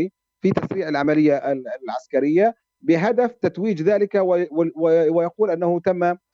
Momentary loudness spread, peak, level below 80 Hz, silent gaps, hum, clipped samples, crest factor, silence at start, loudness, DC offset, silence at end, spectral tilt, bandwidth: 7 LU; -4 dBFS; -64 dBFS; none; none; under 0.1%; 16 dB; 0 s; -20 LUFS; under 0.1%; 0.2 s; -8 dB/octave; 7.2 kHz